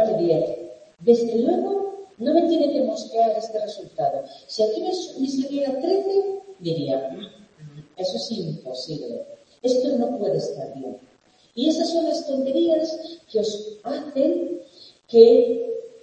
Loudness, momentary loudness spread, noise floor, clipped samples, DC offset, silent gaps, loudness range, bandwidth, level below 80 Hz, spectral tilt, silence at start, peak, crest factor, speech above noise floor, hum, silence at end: -22 LUFS; 15 LU; -57 dBFS; under 0.1%; under 0.1%; none; 6 LU; 8.6 kHz; -70 dBFS; -6 dB/octave; 0 s; 0 dBFS; 22 dB; 36 dB; none; 0.05 s